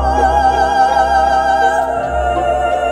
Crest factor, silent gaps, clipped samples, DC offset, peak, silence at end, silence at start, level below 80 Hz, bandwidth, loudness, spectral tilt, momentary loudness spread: 10 dB; none; under 0.1%; under 0.1%; -2 dBFS; 0 s; 0 s; -26 dBFS; 12 kHz; -13 LUFS; -5 dB/octave; 4 LU